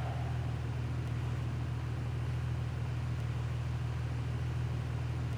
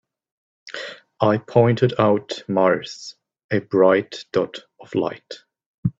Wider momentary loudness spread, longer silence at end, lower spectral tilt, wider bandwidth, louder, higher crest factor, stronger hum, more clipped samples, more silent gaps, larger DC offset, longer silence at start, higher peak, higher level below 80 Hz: second, 1 LU vs 19 LU; about the same, 0 s vs 0.1 s; about the same, -7.5 dB/octave vs -7 dB/octave; first, 10.5 kHz vs 7.8 kHz; second, -37 LUFS vs -20 LUFS; second, 10 dB vs 20 dB; neither; neither; second, none vs 3.44-3.49 s, 5.66-5.83 s; neither; second, 0 s vs 0.65 s; second, -26 dBFS vs -2 dBFS; first, -44 dBFS vs -58 dBFS